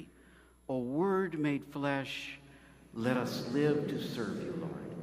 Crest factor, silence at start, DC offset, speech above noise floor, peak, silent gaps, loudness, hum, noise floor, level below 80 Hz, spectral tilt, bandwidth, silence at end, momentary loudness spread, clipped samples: 20 dB; 0 s; under 0.1%; 27 dB; -16 dBFS; none; -35 LUFS; none; -60 dBFS; -66 dBFS; -6.5 dB/octave; 15.5 kHz; 0 s; 13 LU; under 0.1%